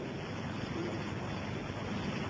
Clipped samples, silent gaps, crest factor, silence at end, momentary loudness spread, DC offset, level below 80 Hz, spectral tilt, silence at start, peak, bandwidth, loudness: under 0.1%; none; 14 dB; 0 s; 2 LU; under 0.1%; -54 dBFS; -6 dB/octave; 0 s; -24 dBFS; 8 kHz; -39 LUFS